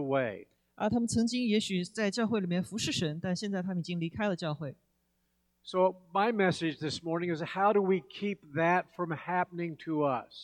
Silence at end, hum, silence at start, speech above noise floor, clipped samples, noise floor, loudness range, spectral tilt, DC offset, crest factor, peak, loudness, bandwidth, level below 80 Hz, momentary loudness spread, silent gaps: 0 s; none; 0 s; 45 dB; under 0.1%; -76 dBFS; 4 LU; -5.5 dB/octave; under 0.1%; 18 dB; -14 dBFS; -32 LUFS; 13 kHz; -66 dBFS; 9 LU; none